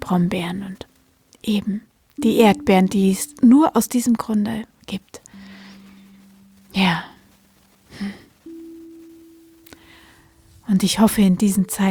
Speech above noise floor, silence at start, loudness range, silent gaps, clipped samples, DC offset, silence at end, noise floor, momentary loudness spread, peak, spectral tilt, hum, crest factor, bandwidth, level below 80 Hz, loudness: 38 dB; 0 s; 13 LU; none; under 0.1%; under 0.1%; 0 s; -56 dBFS; 25 LU; -2 dBFS; -5.5 dB/octave; none; 20 dB; over 20 kHz; -52 dBFS; -18 LUFS